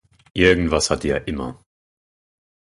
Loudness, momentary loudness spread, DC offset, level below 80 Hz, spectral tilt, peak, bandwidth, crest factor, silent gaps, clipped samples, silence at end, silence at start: -19 LUFS; 15 LU; under 0.1%; -38 dBFS; -4.5 dB/octave; 0 dBFS; 11.5 kHz; 22 dB; none; under 0.1%; 1.1 s; 0.35 s